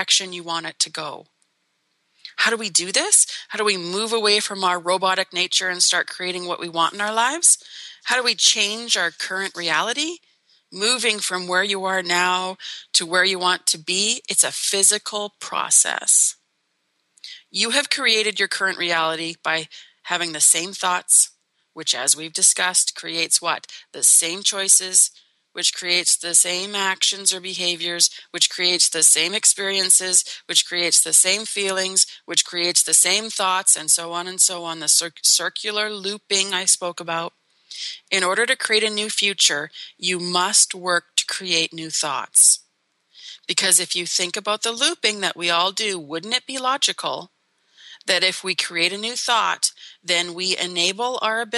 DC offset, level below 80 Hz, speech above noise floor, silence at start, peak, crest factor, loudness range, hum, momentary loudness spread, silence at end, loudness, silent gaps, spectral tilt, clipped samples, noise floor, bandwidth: under 0.1%; -84 dBFS; 50 dB; 0 s; -2 dBFS; 18 dB; 5 LU; none; 11 LU; 0 s; -18 LUFS; none; 0.5 dB/octave; under 0.1%; -71 dBFS; 13 kHz